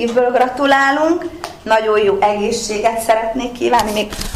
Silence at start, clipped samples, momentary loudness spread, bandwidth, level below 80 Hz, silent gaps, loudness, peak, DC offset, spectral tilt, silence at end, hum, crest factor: 0 s; under 0.1%; 8 LU; 15.5 kHz; -38 dBFS; none; -15 LUFS; -2 dBFS; 0.2%; -3.5 dB/octave; 0 s; none; 14 dB